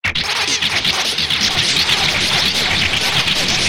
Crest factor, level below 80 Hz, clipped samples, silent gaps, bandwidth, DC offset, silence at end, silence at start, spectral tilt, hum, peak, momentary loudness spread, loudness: 14 dB; -38 dBFS; under 0.1%; none; 17 kHz; under 0.1%; 0 s; 0 s; -1 dB/octave; none; -2 dBFS; 3 LU; -14 LUFS